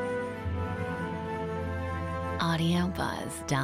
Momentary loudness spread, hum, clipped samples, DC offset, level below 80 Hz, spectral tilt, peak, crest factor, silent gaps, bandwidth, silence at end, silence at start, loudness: 7 LU; none; under 0.1%; under 0.1%; -48 dBFS; -5.5 dB/octave; -16 dBFS; 16 dB; none; 15.5 kHz; 0 s; 0 s; -32 LUFS